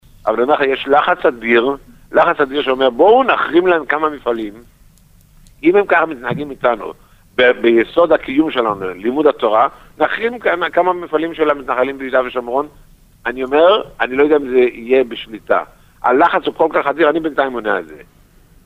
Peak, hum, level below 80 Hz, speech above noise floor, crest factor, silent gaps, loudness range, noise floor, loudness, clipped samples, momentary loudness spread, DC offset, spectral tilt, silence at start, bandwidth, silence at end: -2 dBFS; none; -48 dBFS; 33 dB; 14 dB; none; 4 LU; -47 dBFS; -15 LUFS; under 0.1%; 9 LU; under 0.1%; -6.5 dB/octave; 0.25 s; 14.5 kHz; 0.65 s